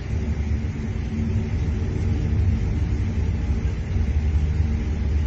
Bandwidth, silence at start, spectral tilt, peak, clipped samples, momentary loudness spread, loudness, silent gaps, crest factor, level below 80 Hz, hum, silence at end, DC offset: 7.4 kHz; 0 s; -8.5 dB/octave; -10 dBFS; under 0.1%; 4 LU; -25 LUFS; none; 12 dB; -26 dBFS; none; 0 s; under 0.1%